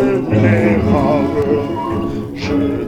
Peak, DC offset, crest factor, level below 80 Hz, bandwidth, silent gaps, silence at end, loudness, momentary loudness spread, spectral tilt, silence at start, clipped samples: 0 dBFS; under 0.1%; 14 dB; -34 dBFS; 10.5 kHz; none; 0 s; -15 LUFS; 8 LU; -8.5 dB/octave; 0 s; under 0.1%